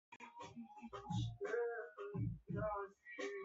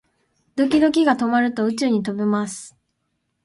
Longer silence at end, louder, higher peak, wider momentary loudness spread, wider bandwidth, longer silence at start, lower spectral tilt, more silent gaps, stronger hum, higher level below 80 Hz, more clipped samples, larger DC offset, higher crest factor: second, 0 s vs 0.75 s; second, -46 LUFS vs -20 LUFS; second, -30 dBFS vs -4 dBFS; about the same, 12 LU vs 11 LU; second, 7.8 kHz vs 11.5 kHz; second, 0.1 s vs 0.55 s; about the same, -6 dB/octave vs -5 dB/octave; first, 0.16-0.20 s vs none; neither; about the same, -64 dBFS vs -60 dBFS; neither; neither; about the same, 16 dB vs 16 dB